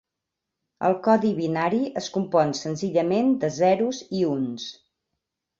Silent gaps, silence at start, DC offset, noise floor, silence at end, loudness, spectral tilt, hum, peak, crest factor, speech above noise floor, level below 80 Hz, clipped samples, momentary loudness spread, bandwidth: none; 0.8 s; under 0.1%; -84 dBFS; 0.85 s; -24 LUFS; -6 dB/octave; none; -6 dBFS; 18 dB; 61 dB; -66 dBFS; under 0.1%; 7 LU; 7.6 kHz